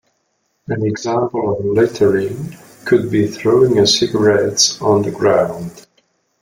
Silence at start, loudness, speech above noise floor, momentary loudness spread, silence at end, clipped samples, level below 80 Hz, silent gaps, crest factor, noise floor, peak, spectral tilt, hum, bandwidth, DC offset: 0.7 s; -15 LUFS; 52 dB; 13 LU; 0.6 s; under 0.1%; -52 dBFS; none; 16 dB; -66 dBFS; 0 dBFS; -4.5 dB/octave; none; 16 kHz; under 0.1%